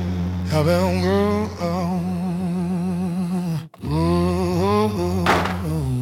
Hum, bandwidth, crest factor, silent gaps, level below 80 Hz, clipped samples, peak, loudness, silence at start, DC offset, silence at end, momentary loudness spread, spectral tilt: none; 16 kHz; 16 dB; none; -44 dBFS; under 0.1%; -6 dBFS; -21 LUFS; 0 s; under 0.1%; 0 s; 6 LU; -7 dB/octave